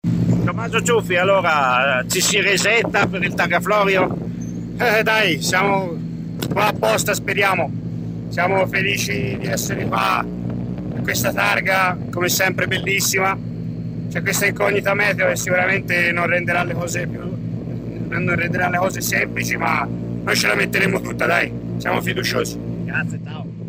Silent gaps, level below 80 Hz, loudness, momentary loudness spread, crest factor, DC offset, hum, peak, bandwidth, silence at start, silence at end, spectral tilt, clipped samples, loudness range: none; -44 dBFS; -19 LUFS; 11 LU; 16 dB; under 0.1%; none; -4 dBFS; 16 kHz; 0.05 s; 0 s; -4 dB/octave; under 0.1%; 4 LU